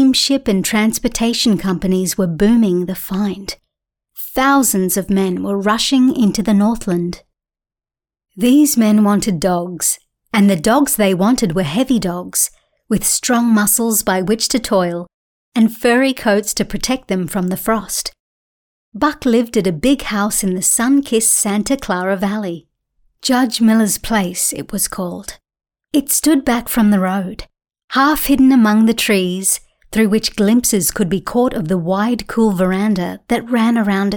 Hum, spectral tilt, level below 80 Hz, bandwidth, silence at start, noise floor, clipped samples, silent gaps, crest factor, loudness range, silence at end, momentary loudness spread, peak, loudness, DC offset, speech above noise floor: none; -4 dB/octave; -42 dBFS; 19 kHz; 0 s; under -90 dBFS; under 0.1%; 15.14-15.52 s, 18.20-18.92 s, 27.84-27.88 s; 14 dB; 3 LU; 0 s; 8 LU; -2 dBFS; -15 LUFS; under 0.1%; over 75 dB